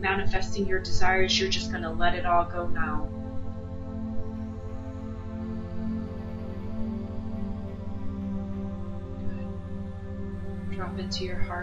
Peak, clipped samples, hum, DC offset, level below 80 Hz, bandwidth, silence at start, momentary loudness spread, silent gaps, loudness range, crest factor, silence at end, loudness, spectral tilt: -10 dBFS; under 0.1%; none; under 0.1%; -38 dBFS; 7.8 kHz; 0 s; 12 LU; none; 9 LU; 18 dB; 0 s; -31 LUFS; -5 dB/octave